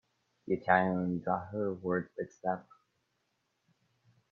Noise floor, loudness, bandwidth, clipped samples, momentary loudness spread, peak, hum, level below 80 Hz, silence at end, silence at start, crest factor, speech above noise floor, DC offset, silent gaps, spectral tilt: -80 dBFS; -33 LUFS; 6.6 kHz; under 0.1%; 12 LU; -10 dBFS; none; -74 dBFS; 1.7 s; 0.45 s; 26 dB; 47 dB; under 0.1%; none; -8.5 dB/octave